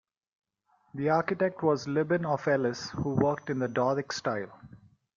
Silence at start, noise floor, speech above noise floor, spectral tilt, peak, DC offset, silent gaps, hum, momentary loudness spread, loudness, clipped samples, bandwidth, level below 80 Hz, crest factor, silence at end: 0.95 s; -69 dBFS; 41 dB; -6.5 dB/octave; -10 dBFS; under 0.1%; none; none; 6 LU; -29 LUFS; under 0.1%; 7.4 kHz; -64 dBFS; 20 dB; 0.4 s